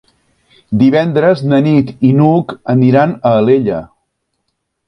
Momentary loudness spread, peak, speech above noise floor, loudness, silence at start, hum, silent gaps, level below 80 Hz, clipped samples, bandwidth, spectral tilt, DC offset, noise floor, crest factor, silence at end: 6 LU; 0 dBFS; 59 dB; -11 LUFS; 0.7 s; none; none; -48 dBFS; under 0.1%; 6 kHz; -9.5 dB/octave; under 0.1%; -69 dBFS; 12 dB; 1.05 s